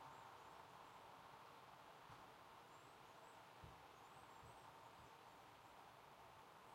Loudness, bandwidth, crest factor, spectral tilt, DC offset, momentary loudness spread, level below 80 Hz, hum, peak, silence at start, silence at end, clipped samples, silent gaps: -63 LUFS; 16 kHz; 14 dB; -3.5 dB/octave; under 0.1%; 2 LU; -82 dBFS; none; -48 dBFS; 0 s; 0 s; under 0.1%; none